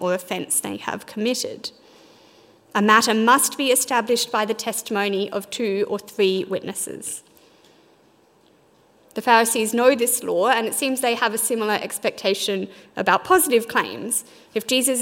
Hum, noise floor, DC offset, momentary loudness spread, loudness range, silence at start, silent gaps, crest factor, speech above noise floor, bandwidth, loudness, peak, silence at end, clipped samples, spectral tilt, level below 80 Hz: none; -57 dBFS; under 0.1%; 12 LU; 6 LU; 0 s; none; 22 dB; 36 dB; 16.5 kHz; -21 LUFS; 0 dBFS; 0 s; under 0.1%; -2.5 dB/octave; -68 dBFS